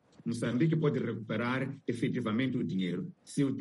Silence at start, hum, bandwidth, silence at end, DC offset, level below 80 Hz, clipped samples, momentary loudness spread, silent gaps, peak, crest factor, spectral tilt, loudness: 0.25 s; none; 11.5 kHz; 0 s; under 0.1%; -70 dBFS; under 0.1%; 7 LU; none; -16 dBFS; 16 dB; -7 dB/octave; -33 LUFS